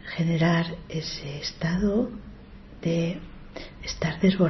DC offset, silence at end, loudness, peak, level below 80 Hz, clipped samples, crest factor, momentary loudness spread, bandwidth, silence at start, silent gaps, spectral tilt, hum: under 0.1%; 0 s; -27 LUFS; -10 dBFS; -44 dBFS; under 0.1%; 16 dB; 19 LU; 6.2 kHz; 0 s; none; -6.5 dB/octave; none